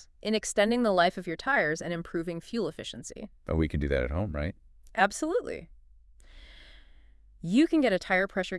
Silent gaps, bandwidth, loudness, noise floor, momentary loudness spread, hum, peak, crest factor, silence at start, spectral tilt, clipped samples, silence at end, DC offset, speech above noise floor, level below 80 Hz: none; 12 kHz; -28 LUFS; -55 dBFS; 15 LU; none; -6 dBFS; 22 dB; 0.25 s; -5 dB/octave; under 0.1%; 0 s; under 0.1%; 27 dB; -46 dBFS